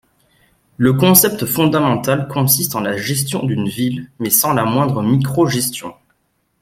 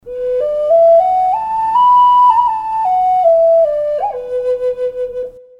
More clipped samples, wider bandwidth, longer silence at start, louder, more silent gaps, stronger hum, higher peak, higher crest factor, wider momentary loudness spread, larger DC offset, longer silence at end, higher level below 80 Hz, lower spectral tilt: neither; first, 16.5 kHz vs 5.4 kHz; first, 0.8 s vs 0.05 s; second, -15 LUFS vs -12 LUFS; neither; neither; about the same, 0 dBFS vs 0 dBFS; about the same, 16 dB vs 12 dB; about the same, 10 LU vs 11 LU; neither; first, 0.7 s vs 0.2 s; about the same, -52 dBFS vs -48 dBFS; about the same, -4.5 dB/octave vs -4.5 dB/octave